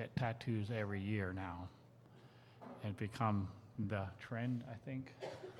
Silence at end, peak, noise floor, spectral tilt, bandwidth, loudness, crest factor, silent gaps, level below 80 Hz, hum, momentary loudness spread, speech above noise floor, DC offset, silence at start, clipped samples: 0 s; -22 dBFS; -62 dBFS; -8 dB/octave; 12 kHz; -43 LUFS; 20 dB; none; -74 dBFS; none; 19 LU; 20 dB; under 0.1%; 0 s; under 0.1%